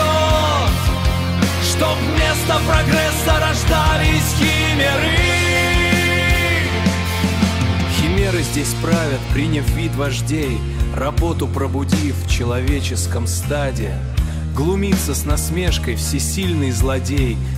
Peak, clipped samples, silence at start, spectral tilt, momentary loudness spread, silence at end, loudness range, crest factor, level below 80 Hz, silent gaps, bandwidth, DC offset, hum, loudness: -2 dBFS; under 0.1%; 0 s; -4.5 dB/octave; 6 LU; 0 s; 5 LU; 14 dB; -24 dBFS; none; 16 kHz; 0.2%; none; -17 LUFS